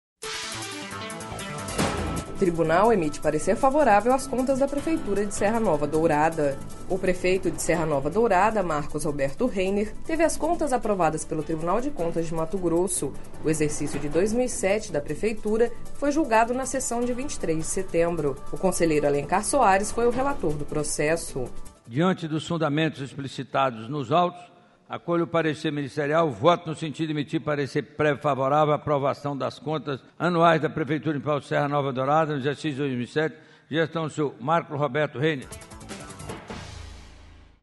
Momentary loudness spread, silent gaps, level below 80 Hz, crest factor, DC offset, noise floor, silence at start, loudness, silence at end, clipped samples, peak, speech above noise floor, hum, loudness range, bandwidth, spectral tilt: 12 LU; none; -40 dBFS; 20 dB; under 0.1%; -49 dBFS; 0.2 s; -25 LUFS; 0.25 s; under 0.1%; -4 dBFS; 25 dB; none; 4 LU; 11.5 kHz; -5 dB/octave